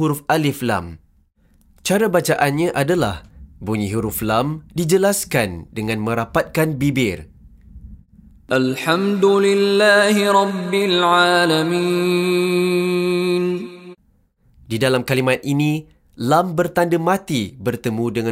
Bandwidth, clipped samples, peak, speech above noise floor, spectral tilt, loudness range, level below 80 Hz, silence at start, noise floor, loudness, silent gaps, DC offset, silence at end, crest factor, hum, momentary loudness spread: 16 kHz; under 0.1%; -2 dBFS; 41 dB; -5 dB/octave; 6 LU; -48 dBFS; 0 s; -59 dBFS; -18 LUFS; none; under 0.1%; 0 s; 18 dB; none; 10 LU